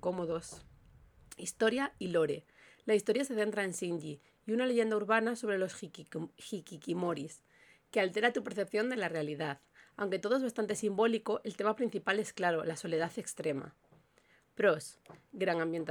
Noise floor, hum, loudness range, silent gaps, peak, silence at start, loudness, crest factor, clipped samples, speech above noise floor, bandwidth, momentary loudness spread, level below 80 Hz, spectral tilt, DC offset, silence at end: -68 dBFS; none; 3 LU; none; -14 dBFS; 0.05 s; -34 LUFS; 22 dB; under 0.1%; 35 dB; 19 kHz; 14 LU; -72 dBFS; -4.5 dB/octave; under 0.1%; 0 s